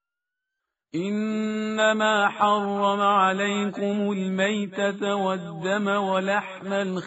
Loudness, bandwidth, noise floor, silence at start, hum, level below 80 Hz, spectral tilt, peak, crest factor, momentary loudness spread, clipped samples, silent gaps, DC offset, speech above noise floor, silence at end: -24 LUFS; 8 kHz; -86 dBFS; 0.95 s; none; -70 dBFS; -3.5 dB/octave; -8 dBFS; 18 dB; 7 LU; under 0.1%; none; under 0.1%; 62 dB; 0 s